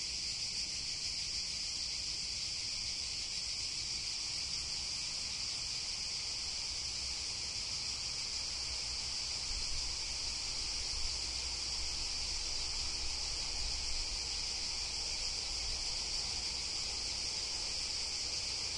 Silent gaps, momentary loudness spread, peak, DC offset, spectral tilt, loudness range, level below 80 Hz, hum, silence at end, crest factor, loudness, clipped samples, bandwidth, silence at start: none; 1 LU; -24 dBFS; under 0.1%; 0 dB/octave; 1 LU; -50 dBFS; none; 0 s; 14 dB; -36 LUFS; under 0.1%; 11.5 kHz; 0 s